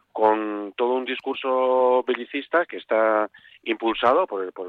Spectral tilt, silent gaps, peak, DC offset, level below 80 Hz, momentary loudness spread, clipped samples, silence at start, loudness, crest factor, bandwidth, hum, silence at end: -6 dB/octave; none; -6 dBFS; under 0.1%; -66 dBFS; 8 LU; under 0.1%; 0.15 s; -23 LUFS; 16 dB; 4.7 kHz; none; 0 s